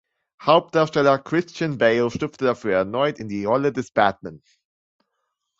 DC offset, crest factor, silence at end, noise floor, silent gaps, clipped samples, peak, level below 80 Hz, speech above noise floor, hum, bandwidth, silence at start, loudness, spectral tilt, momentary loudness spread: under 0.1%; 20 dB; 1.25 s; -77 dBFS; none; under 0.1%; -2 dBFS; -58 dBFS; 56 dB; none; 7.8 kHz; 0.4 s; -21 LUFS; -6 dB/octave; 9 LU